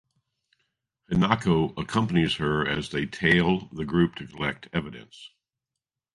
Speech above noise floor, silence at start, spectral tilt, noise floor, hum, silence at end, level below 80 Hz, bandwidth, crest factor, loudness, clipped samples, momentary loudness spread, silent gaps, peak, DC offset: 63 dB; 1.1 s; -6.5 dB/octave; -88 dBFS; none; 0.85 s; -50 dBFS; 11.5 kHz; 24 dB; -25 LUFS; under 0.1%; 10 LU; none; -4 dBFS; under 0.1%